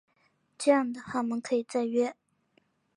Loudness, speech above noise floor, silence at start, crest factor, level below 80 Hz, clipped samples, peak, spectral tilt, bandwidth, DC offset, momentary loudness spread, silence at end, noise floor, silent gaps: -29 LUFS; 43 dB; 0.6 s; 20 dB; -78 dBFS; under 0.1%; -10 dBFS; -4.5 dB/octave; 11 kHz; under 0.1%; 7 LU; 0.85 s; -71 dBFS; none